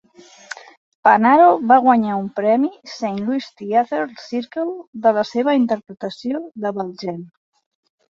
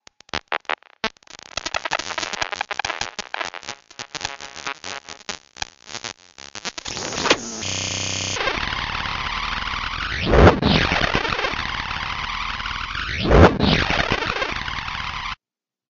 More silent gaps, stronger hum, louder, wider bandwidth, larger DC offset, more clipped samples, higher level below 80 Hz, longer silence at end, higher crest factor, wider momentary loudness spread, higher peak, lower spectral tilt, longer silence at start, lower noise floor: first, 4.87-4.93 s vs none; neither; first, -18 LUFS vs -22 LUFS; about the same, 7.8 kHz vs 7.8 kHz; neither; neither; second, -66 dBFS vs -32 dBFS; first, 0.85 s vs 0.6 s; about the same, 18 dB vs 22 dB; about the same, 17 LU vs 16 LU; about the same, -2 dBFS vs 0 dBFS; first, -6.5 dB/octave vs -4 dB/octave; first, 1.05 s vs 0.35 s; second, -39 dBFS vs under -90 dBFS